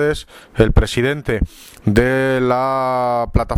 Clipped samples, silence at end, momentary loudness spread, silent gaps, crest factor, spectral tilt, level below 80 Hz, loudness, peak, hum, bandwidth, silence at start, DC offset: under 0.1%; 0 s; 9 LU; none; 16 dB; -6.5 dB/octave; -24 dBFS; -17 LUFS; 0 dBFS; none; 17.5 kHz; 0 s; under 0.1%